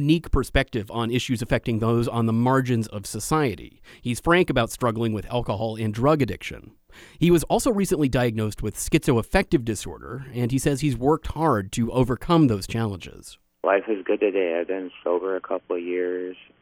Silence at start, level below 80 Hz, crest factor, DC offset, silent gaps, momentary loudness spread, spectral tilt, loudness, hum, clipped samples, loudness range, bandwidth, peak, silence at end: 0 s; -40 dBFS; 20 dB; under 0.1%; none; 10 LU; -6 dB/octave; -24 LUFS; none; under 0.1%; 2 LU; 17 kHz; -4 dBFS; 0.3 s